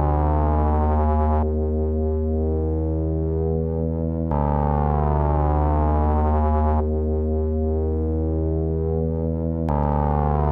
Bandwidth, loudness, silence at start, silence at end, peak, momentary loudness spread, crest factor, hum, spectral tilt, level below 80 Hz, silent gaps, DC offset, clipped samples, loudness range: 2.8 kHz; -22 LUFS; 0 s; 0 s; -8 dBFS; 3 LU; 12 dB; none; -12.5 dB/octave; -24 dBFS; none; under 0.1%; under 0.1%; 2 LU